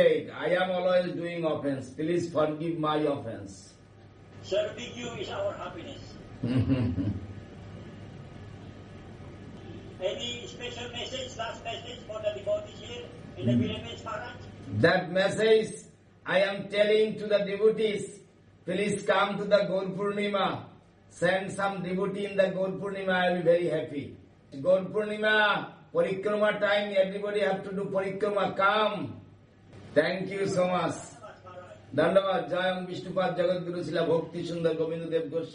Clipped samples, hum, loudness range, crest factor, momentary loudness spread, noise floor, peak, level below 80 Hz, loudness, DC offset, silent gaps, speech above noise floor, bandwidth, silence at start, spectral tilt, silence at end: under 0.1%; none; 9 LU; 20 dB; 20 LU; -54 dBFS; -10 dBFS; -62 dBFS; -29 LUFS; under 0.1%; none; 26 dB; 10 kHz; 0 s; -5.5 dB/octave; 0 s